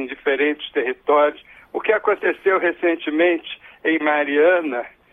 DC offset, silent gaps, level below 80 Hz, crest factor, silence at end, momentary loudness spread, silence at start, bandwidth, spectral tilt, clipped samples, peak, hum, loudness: under 0.1%; none; -64 dBFS; 16 dB; 0.25 s; 9 LU; 0 s; 3.8 kHz; -6 dB/octave; under 0.1%; -4 dBFS; none; -19 LUFS